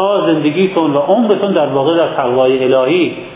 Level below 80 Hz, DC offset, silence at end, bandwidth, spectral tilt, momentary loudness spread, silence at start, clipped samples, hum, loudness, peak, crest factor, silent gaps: -56 dBFS; under 0.1%; 0 s; 4 kHz; -10.5 dB/octave; 2 LU; 0 s; under 0.1%; none; -12 LUFS; 0 dBFS; 12 dB; none